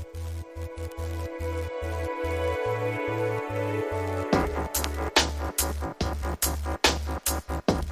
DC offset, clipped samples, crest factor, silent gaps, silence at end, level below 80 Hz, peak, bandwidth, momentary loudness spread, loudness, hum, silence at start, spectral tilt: under 0.1%; under 0.1%; 22 dB; none; 0 s; -36 dBFS; -6 dBFS; 16 kHz; 11 LU; -28 LUFS; none; 0 s; -4 dB/octave